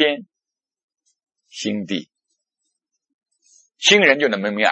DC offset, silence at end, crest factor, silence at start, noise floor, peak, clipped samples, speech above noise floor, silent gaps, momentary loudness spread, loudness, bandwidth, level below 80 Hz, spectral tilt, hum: under 0.1%; 0 s; 22 dB; 0 s; -88 dBFS; 0 dBFS; under 0.1%; 70 dB; 0.83-0.88 s, 3.14-3.19 s; 16 LU; -17 LUFS; 8.4 kHz; -74 dBFS; -2.5 dB/octave; none